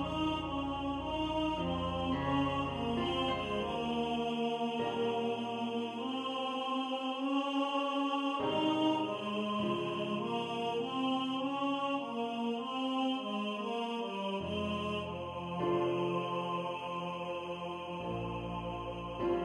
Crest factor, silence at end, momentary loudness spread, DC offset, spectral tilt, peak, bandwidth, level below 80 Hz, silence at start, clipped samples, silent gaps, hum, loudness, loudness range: 16 dB; 0 s; 6 LU; under 0.1%; -6 dB/octave; -20 dBFS; 11 kHz; -58 dBFS; 0 s; under 0.1%; none; none; -35 LUFS; 3 LU